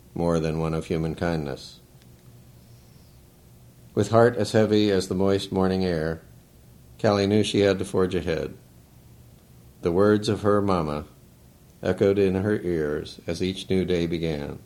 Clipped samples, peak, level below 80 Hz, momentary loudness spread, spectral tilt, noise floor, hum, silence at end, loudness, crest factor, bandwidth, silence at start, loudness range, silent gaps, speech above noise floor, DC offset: under 0.1%; -4 dBFS; -48 dBFS; 10 LU; -6.5 dB/octave; -52 dBFS; none; 0.1 s; -24 LUFS; 22 dB; 16.5 kHz; 0.15 s; 6 LU; none; 29 dB; under 0.1%